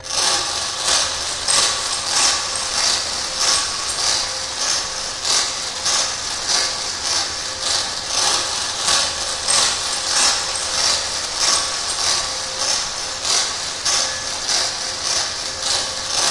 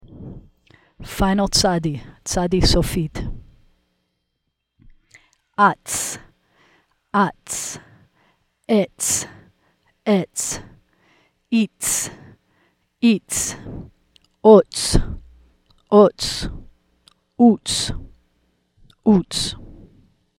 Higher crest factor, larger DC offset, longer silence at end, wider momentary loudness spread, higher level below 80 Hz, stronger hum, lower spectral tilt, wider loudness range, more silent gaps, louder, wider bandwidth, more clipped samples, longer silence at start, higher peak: about the same, 18 dB vs 20 dB; first, 0.1% vs under 0.1%; second, 0 s vs 0.65 s; second, 6 LU vs 20 LU; second, -46 dBFS vs -34 dBFS; neither; second, 1 dB/octave vs -4 dB/octave; second, 2 LU vs 7 LU; neither; about the same, -18 LUFS vs -19 LUFS; second, 11.5 kHz vs 17 kHz; neither; about the same, 0 s vs 0.1 s; second, -4 dBFS vs 0 dBFS